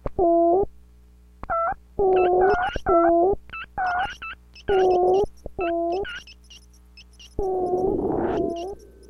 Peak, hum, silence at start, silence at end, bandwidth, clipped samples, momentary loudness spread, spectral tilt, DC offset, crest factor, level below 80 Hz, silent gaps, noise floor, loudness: -8 dBFS; 60 Hz at -50 dBFS; 0.05 s; 0.3 s; 11 kHz; under 0.1%; 15 LU; -7 dB/octave; under 0.1%; 16 dB; -42 dBFS; none; -51 dBFS; -23 LUFS